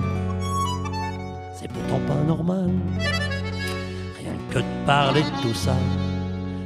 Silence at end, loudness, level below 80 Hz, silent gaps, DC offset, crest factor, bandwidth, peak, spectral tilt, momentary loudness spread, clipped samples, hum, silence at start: 0 s; -25 LUFS; -44 dBFS; none; under 0.1%; 20 dB; 13.5 kHz; -4 dBFS; -6 dB/octave; 11 LU; under 0.1%; none; 0 s